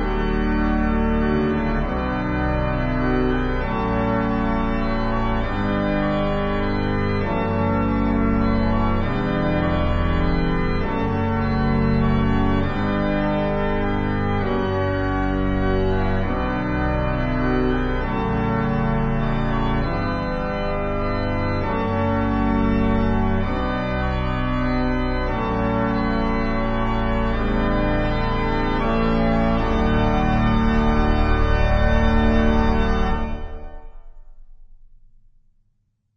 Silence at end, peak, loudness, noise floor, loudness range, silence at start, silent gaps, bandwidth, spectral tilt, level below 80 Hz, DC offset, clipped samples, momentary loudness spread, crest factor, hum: 1.4 s; -6 dBFS; -22 LUFS; -67 dBFS; 3 LU; 0 s; none; 6.4 kHz; -8.5 dB/octave; -26 dBFS; under 0.1%; under 0.1%; 4 LU; 14 dB; none